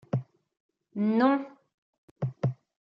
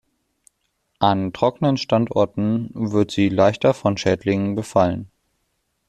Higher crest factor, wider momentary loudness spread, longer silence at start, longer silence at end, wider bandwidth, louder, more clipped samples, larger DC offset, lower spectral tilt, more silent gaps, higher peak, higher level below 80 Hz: about the same, 20 dB vs 18 dB; first, 14 LU vs 6 LU; second, 0.15 s vs 1 s; second, 0.3 s vs 0.85 s; second, 6.2 kHz vs 12 kHz; second, -29 LUFS vs -20 LUFS; neither; neither; first, -9.5 dB/octave vs -6.5 dB/octave; first, 0.60-0.69 s, 1.74-2.16 s vs none; second, -12 dBFS vs -2 dBFS; second, -72 dBFS vs -54 dBFS